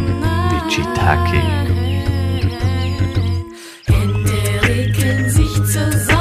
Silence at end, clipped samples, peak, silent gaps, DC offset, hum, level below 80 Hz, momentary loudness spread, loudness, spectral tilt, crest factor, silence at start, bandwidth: 0 s; under 0.1%; 0 dBFS; none; under 0.1%; none; -26 dBFS; 4 LU; -17 LUFS; -5.5 dB/octave; 14 dB; 0 s; 15.5 kHz